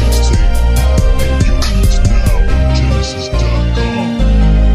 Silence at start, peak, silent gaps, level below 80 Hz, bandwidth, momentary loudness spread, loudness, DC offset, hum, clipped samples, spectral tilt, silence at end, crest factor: 0 s; 0 dBFS; none; -10 dBFS; 15 kHz; 3 LU; -13 LUFS; under 0.1%; none; under 0.1%; -6 dB/octave; 0 s; 10 dB